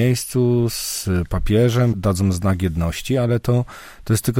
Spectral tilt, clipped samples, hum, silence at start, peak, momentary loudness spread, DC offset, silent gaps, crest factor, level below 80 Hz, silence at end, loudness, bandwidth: -6 dB/octave; under 0.1%; none; 0 s; -4 dBFS; 5 LU; under 0.1%; none; 14 dB; -34 dBFS; 0 s; -20 LUFS; 17 kHz